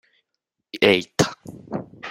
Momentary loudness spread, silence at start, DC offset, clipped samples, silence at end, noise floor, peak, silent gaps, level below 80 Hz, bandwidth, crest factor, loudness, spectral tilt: 19 LU; 0.75 s; under 0.1%; under 0.1%; 0 s; -81 dBFS; 0 dBFS; none; -58 dBFS; 16 kHz; 24 dB; -20 LUFS; -4 dB/octave